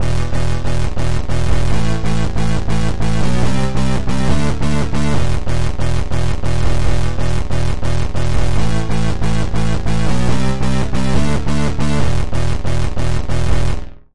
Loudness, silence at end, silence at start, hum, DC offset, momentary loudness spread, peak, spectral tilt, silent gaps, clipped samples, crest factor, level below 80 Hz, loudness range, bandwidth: -19 LUFS; 0 s; 0 s; none; 20%; 3 LU; -2 dBFS; -6 dB/octave; none; under 0.1%; 12 dB; -22 dBFS; 1 LU; 11.5 kHz